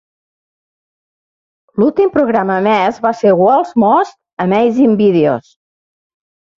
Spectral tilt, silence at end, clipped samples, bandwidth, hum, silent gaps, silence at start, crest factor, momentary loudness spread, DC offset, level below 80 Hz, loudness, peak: -8 dB/octave; 1.15 s; under 0.1%; 7.4 kHz; none; 4.33-4.37 s; 1.75 s; 12 dB; 6 LU; under 0.1%; -56 dBFS; -12 LUFS; -2 dBFS